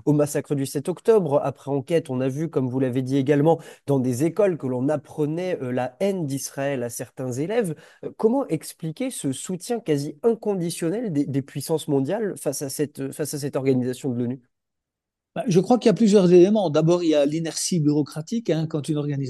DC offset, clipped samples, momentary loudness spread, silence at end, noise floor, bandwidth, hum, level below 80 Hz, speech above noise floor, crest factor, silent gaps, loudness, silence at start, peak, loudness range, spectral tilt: under 0.1%; under 0.1%; 10 LU; 0 s; -85 dBFS; 12.5 kHz; none; -70 dBFS; 63 dB; 18 dB; none; -23 LUFS; 0.05 s; -4 dBFS; 7 LU; -6.5 dB/octave